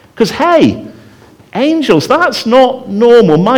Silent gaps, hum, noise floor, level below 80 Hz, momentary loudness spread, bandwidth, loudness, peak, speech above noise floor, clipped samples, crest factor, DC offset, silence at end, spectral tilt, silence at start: none; none; -40 dBFS; -46 dBFS; 8 LU; 17 kHz; -9 LUFS; 0 dBFS; 31 dB; 0.2%; 10 dB; under 0.1%; 0 s; -6 dB/octave; 0.15 s